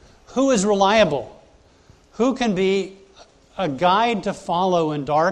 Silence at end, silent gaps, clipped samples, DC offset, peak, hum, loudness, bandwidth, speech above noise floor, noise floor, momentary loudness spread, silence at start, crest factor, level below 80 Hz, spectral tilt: 0 s; none; under 0.1%; under 0.1%; -4 dBFS; none; -20 LUFS; 10.5 kHz; 33 dB; -52 dBFS; 12 LU; 0.3 s; 16 dB; -52 dBFS; -5 dB/octave